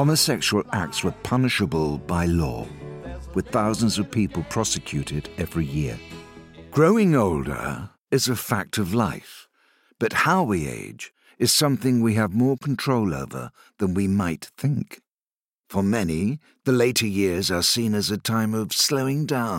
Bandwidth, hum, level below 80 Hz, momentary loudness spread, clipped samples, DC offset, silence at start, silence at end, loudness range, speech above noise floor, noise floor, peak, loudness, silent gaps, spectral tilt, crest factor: 16.5 kHz; none; -48 dBFS; 13 LU; under 0.1%; under 0.1%; 0 s; 0 s; 4 LU; over 67 dB; under -90 dBFS; -4 dBFS; -23 LUFS; 8.01-8.05 s, 15.36-15.53 s; -4.5 dB/octave; 18 dB